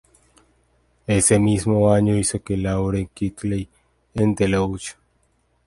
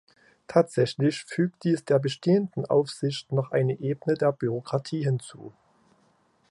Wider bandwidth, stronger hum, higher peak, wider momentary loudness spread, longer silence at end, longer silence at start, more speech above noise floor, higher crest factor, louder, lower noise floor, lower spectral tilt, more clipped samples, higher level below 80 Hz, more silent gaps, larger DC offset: about the same, 11.5 kHz vs 11.5 kHz; neither; about the same, -4 dBFS vs -6 dBFS; first, 15 LU vs 6 LU; second, 0.75 s vs 1 s; first, 1.1 s vs 0.5 s; first, 45 dB vs 40 dB; about the same, 18 dB vs 20 dB; first, -20 LUFS vs -26 LUFS; about the same, -64 dBFS vs -65 dBFS; second, -5.5 dB/octave vs -7 dB/octave; neither; first, -40 dBFS vs -70 dBFS; neither; neither